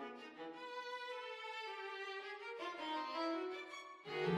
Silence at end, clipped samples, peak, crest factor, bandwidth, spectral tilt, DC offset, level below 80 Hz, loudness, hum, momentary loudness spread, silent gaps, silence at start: 0 s; under 0.1%; -26 dBFS; 20 dB; 14 kHz; -5.5 dB/octave; under 0.1%; -86 dBFS; -46 LUFS; none; 9 LU; none; 0 s